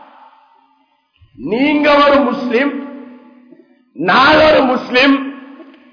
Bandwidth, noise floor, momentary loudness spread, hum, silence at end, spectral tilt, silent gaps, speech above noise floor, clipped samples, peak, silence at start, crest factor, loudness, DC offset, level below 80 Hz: 5.4 kHz; -58 dBFS; 19 LU; none; 0.3 s; -5.5 dB/octave; none; 46 dB; under 0.1%; -2 dBFS; 1.4 s; 12 dB; -11 LUFS; under 0.1%; -46 dBFS